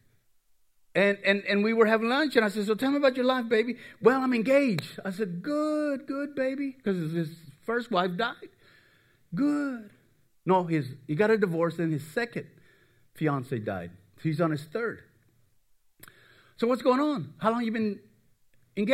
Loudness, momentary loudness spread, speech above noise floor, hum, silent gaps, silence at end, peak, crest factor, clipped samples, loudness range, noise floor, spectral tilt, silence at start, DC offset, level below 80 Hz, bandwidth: -28 LUFS; 11 LU; 38 dB; none; none; 0 s; -6 dBFS; 22 dB; under 0.1%; 8 LU; -65 dBFS; -6.5 dB/octave; 0.95 s; under 0.1%; -74 dBFS; 16 kHz